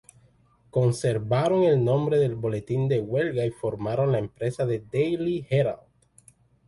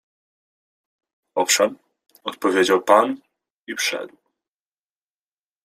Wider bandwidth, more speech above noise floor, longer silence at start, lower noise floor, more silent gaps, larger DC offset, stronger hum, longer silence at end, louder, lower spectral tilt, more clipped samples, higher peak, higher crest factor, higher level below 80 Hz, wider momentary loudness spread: second, 11.5 kHz vs 15.5 kHz; second, 36 dB vs over 71 dB; second, 0.75 s vs 1.35 s; second, -60 dBFS vs under -90 dBFS; second, none vs 3.50-3.66 s; neither; neither; second, 0.9 s vs 1.6 s; second, -25 LUFS vs -19 LUFS; first, -7.5 dB/octave vs -2 dB/octave; neither; second, -10 dBFS vs -2 dBFS; second, 14 dB vs 22 dB; first, -56 dBFS vs -72 dBFS; second, 8 LU vs 17 LU